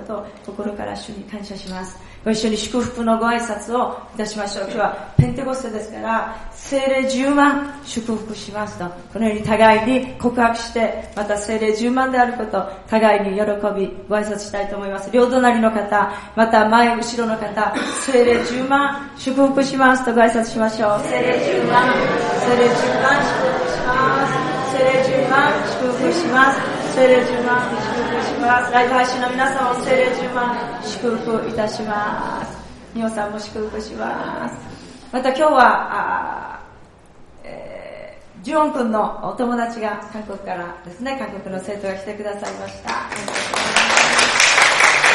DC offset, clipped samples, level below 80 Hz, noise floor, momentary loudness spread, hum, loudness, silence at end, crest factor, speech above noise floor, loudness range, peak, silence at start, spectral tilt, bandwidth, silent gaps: under 0.1%; under 0.1%; -46 dBFS; -44 dBFS; 15 LU; none; -18 LUFS; 0 s; 18 dB; 26 dB; 8 LU; 0 dBFS; 0 s; -4 dB/octave; 11.5 kHz; none